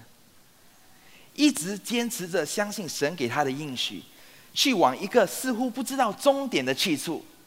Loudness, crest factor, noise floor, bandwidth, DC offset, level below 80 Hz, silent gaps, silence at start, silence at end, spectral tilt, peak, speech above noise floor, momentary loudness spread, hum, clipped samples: -26 LUFS; 20 dB; -56 dBFS; 16 kHz; under 0.1%; -72 dBFS; none; 0 s; 0.2 s; -3 dB/octave; -6 dBFS; 30 dB; 7 LU; none; under 0.1%